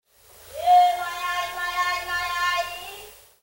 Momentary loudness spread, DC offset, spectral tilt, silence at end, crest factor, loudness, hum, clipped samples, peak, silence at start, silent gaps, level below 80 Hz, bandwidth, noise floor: 19 LU; under 0.1%; -0.5 dB/octave; 0.3 s; 16 dB; -23 LUFS; none; under 0.1%; -8 dBFS; 0.4 s; none; -56 dBFS; 16.5 kHz; -50 dBFS